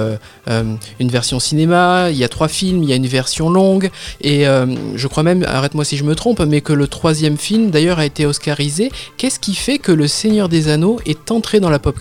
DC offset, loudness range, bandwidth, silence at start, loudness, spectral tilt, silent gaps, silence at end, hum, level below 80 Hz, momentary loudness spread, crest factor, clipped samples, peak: under 0.1%; 1 LU; 16 kHz; 0 s; -15 LUFS; -5 dB/octave; none; 0 s; none; -38 dBFS; 7 LU; 14 dB; under 0.1%; 0 dBFS